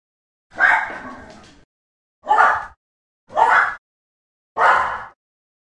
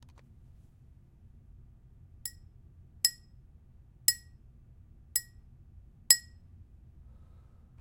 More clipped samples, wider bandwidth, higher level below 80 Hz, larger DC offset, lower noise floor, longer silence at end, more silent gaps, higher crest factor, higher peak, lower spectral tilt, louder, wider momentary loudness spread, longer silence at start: neither; second, 11 kHz vs 16.5 kHz; about the same, -56 dBFS vs -58 dBFS; neither; second, -42 dBFS vs -57 dBFS; second, 0.55 s vs 1.6 s; first, 1.64-2.22 s, 2.77-3.27 s, 3.78-4.55 s vs none; second, 20 dB vs 36 dB; about the same, 0 dBFS vs -2 dBFS; first, -2.5 dB/octave vs 1.5 dB/octave; first, -17 LUFS vs -29 LUFS; about the same, 21 LU vs 19 LU; second, 0.55 s vs 2.25 s